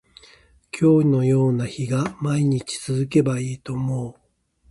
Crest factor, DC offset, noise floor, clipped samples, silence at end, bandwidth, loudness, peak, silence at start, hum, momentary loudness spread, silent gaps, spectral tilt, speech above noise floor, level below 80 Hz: 16 dB; under 0.1%; -60 dBFS; under 0.1%; 0.6 s; 11.5 kHz; -21 LUFS; -6 dBFS; 0.75 s; none; 11 LU; none; -7 dB/octave; 40 dB; -56 dBFS